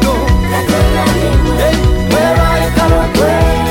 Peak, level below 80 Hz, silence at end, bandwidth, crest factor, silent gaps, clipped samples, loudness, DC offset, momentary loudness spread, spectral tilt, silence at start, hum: 0 dBFS; -16 dBFS; 0 s; 17 kHz; 10 dB; none; under 0.1%; -11 LUFS; under 0.1%; 2 LU; -6 dB/octave; 0 s; none